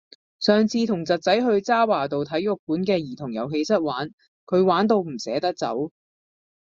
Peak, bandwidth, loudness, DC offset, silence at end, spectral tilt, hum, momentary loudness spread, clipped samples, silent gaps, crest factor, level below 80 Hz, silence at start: -4 dBFS; 7.6 kHz; -23 LUFS; under 0.1%; 0.8 s; -5.5 dB/octave; none; 9 LU; under 0.1%; 2.59-2.67 s, 4.13-4.18 s, 4.28-4.47 s; 20 dB; -66 dBFS; 0.4 s